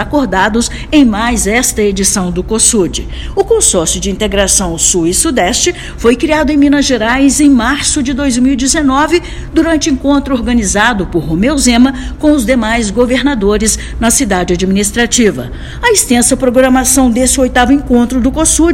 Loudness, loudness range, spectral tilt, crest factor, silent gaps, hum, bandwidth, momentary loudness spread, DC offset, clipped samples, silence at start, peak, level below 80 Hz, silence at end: -10 LUFS; 2 LU; -3.5 dB/octave; 10 dB; none; none; over 20 kHz; 5 LU; under 0.1%; 0.7%; 0 s; 0 dBFS; -24 dBFS; 0 s